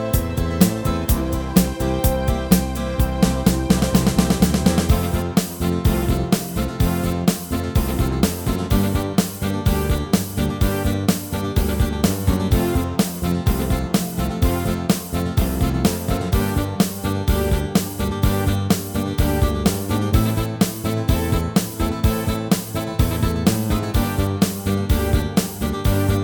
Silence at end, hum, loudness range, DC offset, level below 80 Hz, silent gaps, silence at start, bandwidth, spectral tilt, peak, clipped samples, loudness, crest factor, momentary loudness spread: 0 s; none; 2 LU; under 0.1%; -26 dBFS; none; 0 s; over 20 kHz; -6 dB/octave; 0 dBFS; under 0.1%; -20 LUFS; 18 dB; 4 LU